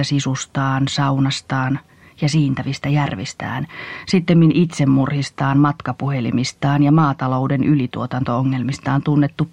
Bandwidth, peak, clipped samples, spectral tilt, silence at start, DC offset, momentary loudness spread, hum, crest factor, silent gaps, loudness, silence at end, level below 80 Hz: 9.8 kHz; -4 dBFS; under 0.1%; -6.5 dB/octave; 0 s; 0.2%; 9 LU; none; 14 dB; none; -18 LUFS; 0.05 s; -52 dBFS